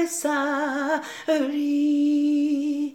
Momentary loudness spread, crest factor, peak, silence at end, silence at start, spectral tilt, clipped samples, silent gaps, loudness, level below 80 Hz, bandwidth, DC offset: 5 LU; 12 dB; -12 dBFS; 0.05 s; 0 s; -2.5 dB/octave; under 0.1%; none; -23 LUFS; -78 dBFS; 15.5 kHz; under 0.1%